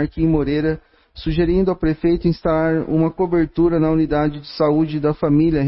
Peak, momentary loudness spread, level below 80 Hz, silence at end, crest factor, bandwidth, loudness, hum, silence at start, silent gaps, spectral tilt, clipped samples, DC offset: -4 dBFS; 4 LU; -34 dBFS; 0 s; 14 dB; 5.8 kHz; -18 LUFS; none; 0 s; none; -12.5 dB/octave; under 0.1%; under 0.1%